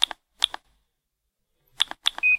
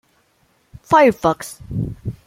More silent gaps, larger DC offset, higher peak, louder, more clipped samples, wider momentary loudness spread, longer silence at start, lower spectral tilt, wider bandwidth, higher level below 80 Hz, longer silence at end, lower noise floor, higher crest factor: neither; neither; about the same, -2 dBFS vs -2 dBFS; second, -25 LUFS vs -18 LUFS; neither; second, 4 LU vs 14 LU; second, 0 s vs 0.9 s; second, 2.5 dB/octave vs -6 dB/octave; about the same, 16 kHz vs 16.5 kHz; second, -64 dBFS vs -44 dBFS; second, 0 s vs 0.15 s; first, -79 dBFS vs -61 dBFS; first, 26 dB vs 18 dB